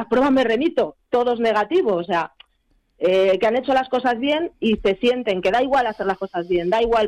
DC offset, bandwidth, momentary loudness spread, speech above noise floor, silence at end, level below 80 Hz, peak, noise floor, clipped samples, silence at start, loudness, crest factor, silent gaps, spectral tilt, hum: under 0.1%; 11 kHz; 7 LU; 45 dB; 0 s; -48 dBFS; -10 dBFS; -64 dBFS; under 0.1%; 0 s; -20 LUFS; 10 dB; none; -6 dB/octave; none